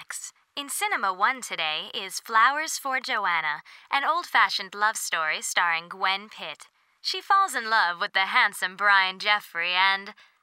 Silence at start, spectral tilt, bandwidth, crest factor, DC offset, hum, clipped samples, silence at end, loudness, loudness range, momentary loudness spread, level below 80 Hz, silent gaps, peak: 0 s; 0.5 dB/octave; 16 kHz; 20 dB; under 0.1%; none; under 0.1%; 0.3 s; -24 LUFS; 3 LU; 12 LU; under -90 dBFS; none; -6 dBFS